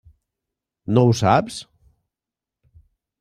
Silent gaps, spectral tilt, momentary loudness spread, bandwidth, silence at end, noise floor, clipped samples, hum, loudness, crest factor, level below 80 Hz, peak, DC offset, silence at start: none; -6.5 dB/octave; 19 LU; 12.5 kHz; 1.6 s; -88 dBFS; under 0.1%; none; -18 LUFS; 20 dB; -56 dBFS; -2 dBFS; under 0.1%; 0.9 s